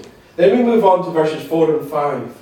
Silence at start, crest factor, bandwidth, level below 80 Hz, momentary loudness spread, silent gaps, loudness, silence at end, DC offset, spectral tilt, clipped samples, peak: 0 s; 14 dB; 18 kHz; -60 dBFS; 7 LU; none; -16 LUFS; 0.1 s; under 0.1%; -7 dB/octave; under 0.1%; -2 dBFS